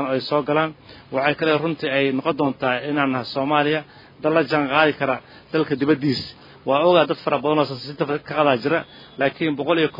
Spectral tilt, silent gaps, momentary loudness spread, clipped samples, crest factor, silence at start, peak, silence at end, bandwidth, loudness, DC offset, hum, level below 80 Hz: -7.5 dB/octave; none; 8 LU; under 0.1%; 20 dB; 0 s; 0 dBFS; 0 s; 5.4 kHz; -21 LUFS; under 0.1%; none; -62 dBFS